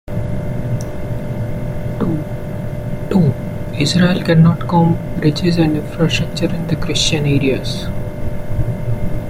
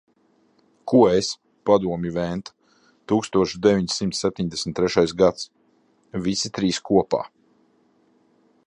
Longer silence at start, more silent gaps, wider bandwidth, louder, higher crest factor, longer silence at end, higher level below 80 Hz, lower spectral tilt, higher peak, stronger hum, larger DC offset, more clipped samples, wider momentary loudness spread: second, 0.05 s vs 0.85 s; neither; first, 15.5 kHz vs 11 kHz; first, -17 LUFS vs -22 LUFS; second, 14 dB vs 20 dB; second, 0 s vs 1.4 s; first, -28 dBFS vs -52 dBFS; about the same, -6 dB/octave vs -5 dB/octave; about the same, -2 dBFS vs -4 dBFS; neither; neither; neither; second, 11 LU vs 14 LU